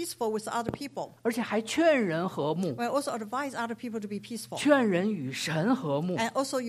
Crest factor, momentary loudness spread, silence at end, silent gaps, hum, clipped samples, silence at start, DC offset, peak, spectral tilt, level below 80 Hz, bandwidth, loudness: 18 dB; 12 LU; 0 s; none; none; under 0.1%; 0 s; under 0.1%; -10 dBFS; -5 dB/octave; -68 dBFS; 15.5 kHz; -29 LUFS